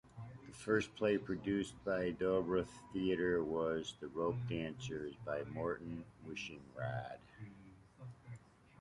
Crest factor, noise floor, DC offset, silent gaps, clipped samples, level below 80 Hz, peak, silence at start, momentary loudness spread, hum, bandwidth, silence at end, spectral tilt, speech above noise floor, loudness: 20 dB; -60 dBFS; under 0.1%; none; under 0.1%; -64 dBFS; -20 dBFS; 0.05 s; 19 LU; none; 11.5 kHz; 0.45 s; -6 dB/octave; 21 dB; -40 LUFS